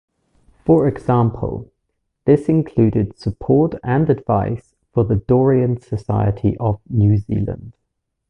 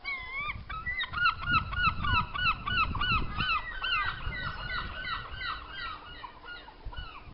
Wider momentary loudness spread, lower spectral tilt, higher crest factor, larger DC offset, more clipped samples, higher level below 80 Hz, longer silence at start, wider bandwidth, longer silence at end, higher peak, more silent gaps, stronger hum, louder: second, 10 LU vs 17 LU; first, -10.5 dB/octave vs -1 dB/octave; about the same, 16 dB vs 20 dB; neither; neither; about the same, -38 dBFS vs -42 dBFS; first, 0.65 s vs 0 s; about the same, 5.8 kHz vs 5.6 kHz; first, 0.6 s vs 0 s; first, -2 dBFS vs -14 dBFS; neither; neither; first, -18 LUFS vs -31 LUFS